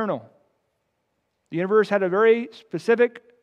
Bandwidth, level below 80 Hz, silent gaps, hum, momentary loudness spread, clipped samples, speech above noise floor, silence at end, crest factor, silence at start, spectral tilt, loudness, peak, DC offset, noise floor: 9.2 kHz; -82 dBFS; none; none; 14 LU; under 0.1%; 53 dB; 0.25 s; 16 dB; 0 s; -7 dB/octave; -21 LUFS; -6 dBFS; under 0.1%; -74 dBFS